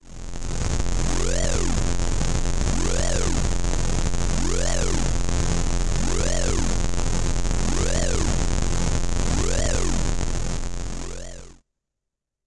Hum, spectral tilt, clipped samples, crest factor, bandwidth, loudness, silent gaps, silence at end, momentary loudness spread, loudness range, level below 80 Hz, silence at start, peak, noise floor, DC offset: none; -4.5 dB/octave; under 0.1%; 10 dB; 11.5 kHz; -25 LUFS; none; 0.9 s; 7 LU; 2 LU; -24 dBFS; 0.05 s; -10 dBFS; -83 dBFS; under 0.1%